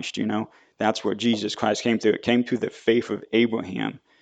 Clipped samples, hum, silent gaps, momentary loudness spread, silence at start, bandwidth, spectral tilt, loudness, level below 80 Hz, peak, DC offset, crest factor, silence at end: under 0.1%; none; none; 8 LU; 0 s; 9 kHz; -5 dB/octave; -24 LUFS; -64 dBFS; -4 dBFS; under 0.1%; 20 dB; 0.25 s